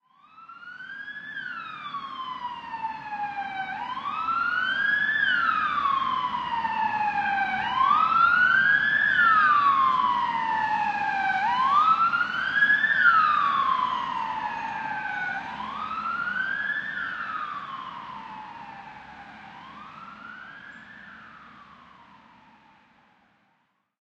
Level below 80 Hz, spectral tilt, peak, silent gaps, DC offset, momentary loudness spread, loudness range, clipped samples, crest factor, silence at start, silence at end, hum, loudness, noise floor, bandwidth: -64 dBFS; -3.5 dB/octave; -8 dBFS; none; under 0.1%; 23 LU; 20 LU; under 0.1%; 18 dB; 0.4 s; 2.4 s; none; -24 LUFS; -71 dBFS; 8.2 kHz